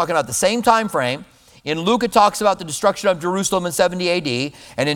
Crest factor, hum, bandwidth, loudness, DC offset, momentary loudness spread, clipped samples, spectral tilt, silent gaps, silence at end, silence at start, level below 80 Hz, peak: 18 dB; none; 19 kHz; -18 LUFS; under 0.1%; 9 LU; under 0.1%; -3.5 dB/octave; none; 0 s; 0 s; -52 dBFS; 0 dBFS